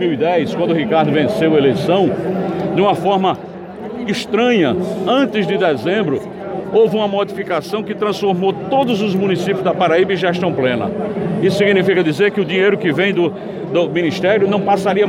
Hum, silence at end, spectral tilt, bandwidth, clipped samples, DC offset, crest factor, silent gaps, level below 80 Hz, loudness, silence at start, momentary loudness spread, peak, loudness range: none; 0 s; -6.5 dB/octave; 15 kHz; under 0.1%; under 0.1%; 12 dB; none; -56 dBFS; -16 LUFS; 0 s; 7 LU; -4 dBFS; 2 LU